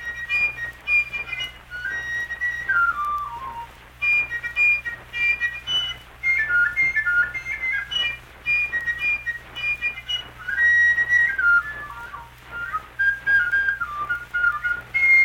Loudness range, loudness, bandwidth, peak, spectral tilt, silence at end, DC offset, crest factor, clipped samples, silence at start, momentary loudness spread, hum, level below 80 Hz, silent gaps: 4 LU; -21 LUFS; 17 kHz; -10 dBFS; -1 dB/octave; 0 s; under 0.1%; 14 dB; under 0.1%; 0 s; 13 LU; 60 Hz at -65 dBFS; -48 dBFS; none